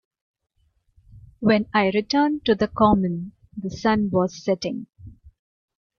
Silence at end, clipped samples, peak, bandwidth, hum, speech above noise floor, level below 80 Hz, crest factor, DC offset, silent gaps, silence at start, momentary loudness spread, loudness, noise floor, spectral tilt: 0.7 s; under 0.1%; -4 dBFS; 7 kHz; none; 41 dB; -48 dBFS; 18 dB; under 0.1%; none; 1.15 s; 15 LU; -22 LUFS; -62 dBFS; -6.5 dB/octave